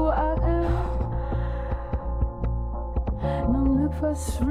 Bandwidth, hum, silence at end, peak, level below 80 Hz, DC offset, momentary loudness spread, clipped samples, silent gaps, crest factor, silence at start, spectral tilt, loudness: 13 kHz; none; 0 s; -12 dBFS; -28 dBFS; under 0.1%; 7 LU; under 0.1%; none; 14 dB; 0 s; -8 dB/octave; -27 LUFS